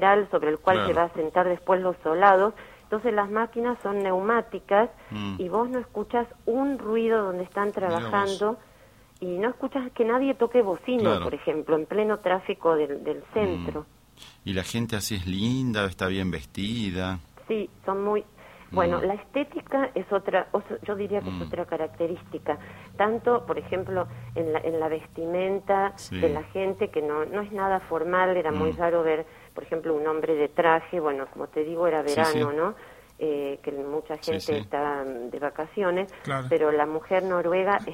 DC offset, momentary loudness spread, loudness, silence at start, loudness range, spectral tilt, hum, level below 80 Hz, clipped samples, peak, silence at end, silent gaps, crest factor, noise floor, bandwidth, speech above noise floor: under 0.1%; 9 LU; -26 LUFS; 0 s; 5 LU; -6 dB/octave; none; -54 dBFS; under 0.1%; -4 dBFS; 0 s; none; 22 dB; -54 dBFS; 16 kHz; 28 dB